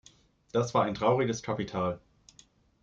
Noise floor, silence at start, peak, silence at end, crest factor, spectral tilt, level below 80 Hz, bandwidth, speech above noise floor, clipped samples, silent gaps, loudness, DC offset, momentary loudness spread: -61 dBFS; 0.55 s; -12 dBFS; 0.85 s; 20 dB; -6 dB/octave; -62 dBFS; 7.8 kHz; 33 dB; under 0.1%; none; -30 LUFS; under 0.1%; 7 LU